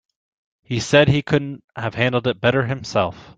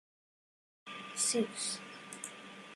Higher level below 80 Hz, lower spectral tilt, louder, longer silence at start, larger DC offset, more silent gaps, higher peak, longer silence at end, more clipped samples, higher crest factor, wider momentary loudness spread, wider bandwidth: first, -48 dBFS vs -88 dBFS; first, -5.5 dB/octave vs -1.5 dB/octave; first, -19 LUFS vs -36 LUFS; second, 0.7 s vs 0.85 s; neither; first, 1.64-1.68 s vs none; first, -2 dBFS vs -18 dBFS; about the same, 0.05 s vs 0 s; neither; about the same, 18 dB vs 22 dB; second, 13 LU vs 17 LU; second, 9.2 kHz vs 13 kHz